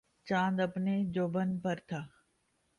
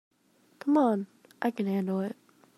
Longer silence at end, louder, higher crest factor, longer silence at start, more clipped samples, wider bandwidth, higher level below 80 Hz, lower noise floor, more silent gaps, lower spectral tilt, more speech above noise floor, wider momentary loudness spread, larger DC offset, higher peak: first, 0.7 s vs 0.45 s; second, -34 LUFS vs -29 LUFS; about the same, 16 dB vs 18 dB; second, 0.25 s vs 0.65 s; neither; second, 7.2 kHz vs 13.5 kHz; first, -70 dBFS vs -82 dBFS; first, -76 dBFS vs -66 dBFS; neither; about the same, -7.5 dB/octave vs -8 dB/octave; first, 43 dB vs 38 dB; second, 11 LU vs 14 LU; neither; second, -18 dBFS vs -12 dBFS